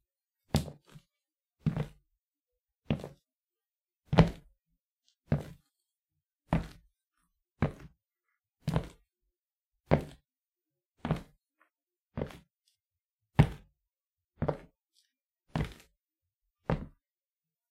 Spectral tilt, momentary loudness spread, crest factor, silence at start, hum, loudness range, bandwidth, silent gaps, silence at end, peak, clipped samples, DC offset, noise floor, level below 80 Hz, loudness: -7.5 dB/octave; 21 LU; 34 dB; 0.55 s; none; 7 LU; 15 kHz; 3.81-3.85 s, 4.92-4.96 s, 13.05-13.17 s; 0.85 s; -4 dBFS; under 0.1%; under 0.1%; under -90 dBFS; -48 dBFS; -34 LUFS